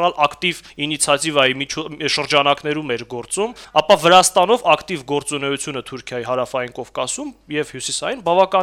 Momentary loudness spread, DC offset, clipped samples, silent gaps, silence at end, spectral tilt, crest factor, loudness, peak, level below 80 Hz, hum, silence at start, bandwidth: 12 LU; under 0.1%; under 0.1%; none; 0 s; -2.5 dB/octave; 16 dB; -18 LUFS; -2 dBFS; -54 dBFS; none; 0 s; 16 kHz